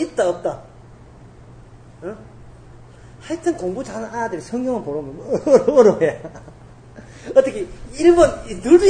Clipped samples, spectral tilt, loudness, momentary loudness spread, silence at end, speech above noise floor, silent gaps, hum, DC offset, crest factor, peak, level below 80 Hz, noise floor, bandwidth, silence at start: under 0.1%; -6 dB/octave; -18 LUFS; 21 LU; 0 s; 25 dB; none; none; under 0.1%; 20 dB; 0 dBFS; -44 dBFS; -43 dBFS; 9.8 kHz; 0 s